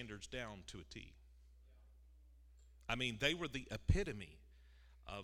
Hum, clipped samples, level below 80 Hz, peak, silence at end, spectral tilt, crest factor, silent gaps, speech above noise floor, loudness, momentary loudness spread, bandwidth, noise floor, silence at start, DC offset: none; under 0.1%; -52 dBFS; -20 dBFS; 0 s; -4.5 dB/octave; 26 dB; none; 22 dB; -42 LUFS; 18 LU; 15.5 kHz; -64 dBFS; 0 s; under 0.1%